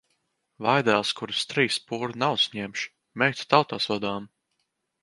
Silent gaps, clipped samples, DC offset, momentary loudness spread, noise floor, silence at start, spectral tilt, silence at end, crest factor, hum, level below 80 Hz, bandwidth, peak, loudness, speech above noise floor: none; under 0.1%; under 0.1%; 11 LU; -77 dBFS; 0.6 s; -4 dB/octave; 0.75 s; 24 dB; none; -68 dBFS; 11.5 kHz; -2 dBFS; -25 LUFS; 52 dB